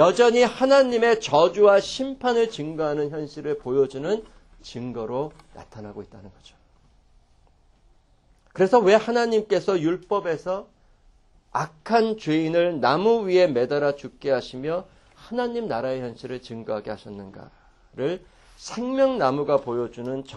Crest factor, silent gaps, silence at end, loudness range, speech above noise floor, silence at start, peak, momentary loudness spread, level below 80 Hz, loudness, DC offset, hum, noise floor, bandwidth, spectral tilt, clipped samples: 20 dB; none; 0 s; 11 LU; 37 dB; 0 s; -4 dBFS; 18 LU; -56 dBFS; -23 LUFS; under 0.1%; none; -59 dBFS; 10.5 kHz; -5.5 dB/octave; under 0.1%